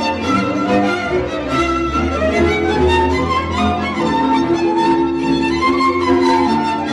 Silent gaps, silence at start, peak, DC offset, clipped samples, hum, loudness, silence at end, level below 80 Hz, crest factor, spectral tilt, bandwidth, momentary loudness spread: none; 0 s; -6 dBFS; under 0.1%; under 0.1%; none; -16 LUFS; 0 s; -32 dBFS; 10 dB; -6 dB/octave; 11.5 kHz; 4 LU